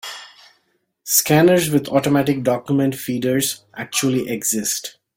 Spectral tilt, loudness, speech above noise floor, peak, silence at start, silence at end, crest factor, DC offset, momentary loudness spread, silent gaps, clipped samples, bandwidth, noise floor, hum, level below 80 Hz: -4 dB/octave; -18 LUFS; 48 dB; -2 dBFS; 0.05 s; 0.25 s; 18 dB; under 0.1%; 11 LU; none; under 0.1%; 17 kHz; -66 dBFS; none; -58 dBFS